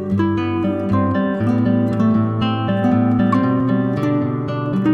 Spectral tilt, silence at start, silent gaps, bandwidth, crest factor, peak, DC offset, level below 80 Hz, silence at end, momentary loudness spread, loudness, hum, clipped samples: -9.5 dB/octave; 0 s; none; 6.4 kHz; 12 dB; -4 dBFS; under 0.1%; -48 dBFS; 0 s; 4 LU; -18 LUFS; none; under 0.1%